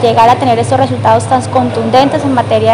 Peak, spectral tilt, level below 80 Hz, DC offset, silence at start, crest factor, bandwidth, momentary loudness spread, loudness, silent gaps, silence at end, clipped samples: 0 dBFS; -6 dB/octave; -50 dBFS; under 0.1%; 0 s; 10 dB; 12.5 kHz; 4 LU; -10 LUFS; none; 0 s; 2%